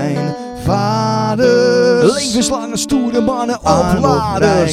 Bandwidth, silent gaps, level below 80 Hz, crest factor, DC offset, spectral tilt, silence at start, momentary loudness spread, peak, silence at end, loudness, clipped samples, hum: 15.5 kHz; none; -36 dBFS; 14 dB; under 0.1%; -5 dB/octave; 0 s; 7 LU; 0 dBFS; 0 s; -14 LUFS; under 0.1%; none